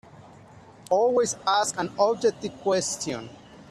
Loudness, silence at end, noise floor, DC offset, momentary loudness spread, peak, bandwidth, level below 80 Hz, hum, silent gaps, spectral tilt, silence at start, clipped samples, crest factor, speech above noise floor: -25 LUFS; 0.1 s; -49 dBFS; under 0.1%; 9 LU; -8 dBFS; 13 kHz; -64 dBFS; none; none; -3 dB/octave; 0.55 s; under 0.1%; 18 dB; 25 dB